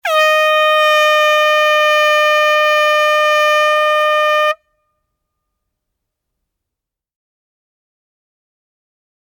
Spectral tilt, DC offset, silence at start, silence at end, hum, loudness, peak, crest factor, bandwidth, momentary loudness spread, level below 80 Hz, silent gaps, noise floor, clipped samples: 4.5 dB/octave; under 0.1%; 0.05 s; 4.65 s; none; -11 LUFS; -2 dBFS; 12 dB; 20 kHz; 2 LU; -78 dBFS; none; -83 dBFS; under 0.1%